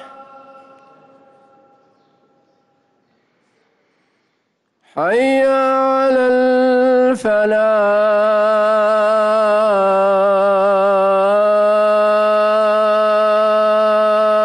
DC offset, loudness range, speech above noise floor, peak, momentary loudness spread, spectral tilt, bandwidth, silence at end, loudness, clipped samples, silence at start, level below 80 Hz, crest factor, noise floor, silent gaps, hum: under 0.1%; 5 LU; 53 dB; -6 dBFS; 1 LU; -5.5 dB/octave; 11 kHz; 0 s; -14 LUFS; under 0.1%; 0 s; -64 dBFS; 8 dB; -67 dBFS; none; none